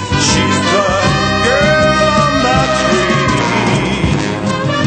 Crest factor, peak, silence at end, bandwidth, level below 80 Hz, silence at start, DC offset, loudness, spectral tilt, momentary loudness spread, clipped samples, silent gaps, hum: 12 dB; 0 dBFS; 0 s; 9.2 kHz; -30 dBFS; 0 s; under 0.1%; -12 LUFS; -4.5 dB/octave; 5 LU; under 0.1%; none; none